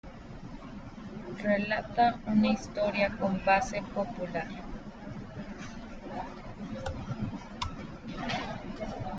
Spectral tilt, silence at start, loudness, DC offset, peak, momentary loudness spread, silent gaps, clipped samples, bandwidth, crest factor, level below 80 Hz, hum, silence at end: -6 dB/octave; 0.05 s; -32 LUFS; under 0.1%; -12 dBFS; 17 LU; none; under 0.1%; 7.8 kHz; 20 dB; -48 dBFS; none; 0 s